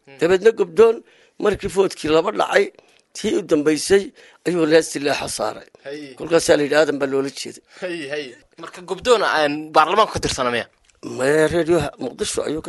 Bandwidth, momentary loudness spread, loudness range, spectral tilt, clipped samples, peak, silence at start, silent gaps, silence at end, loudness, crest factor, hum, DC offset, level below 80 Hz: 12 kHz; 17 LU; 3 LU; -4 dB/octave; under 0.1%; -2 dBFS; 0.1 s; none; 0 s; -19 LUFS; 18 dB; none; under 0.1%; -48 dBFS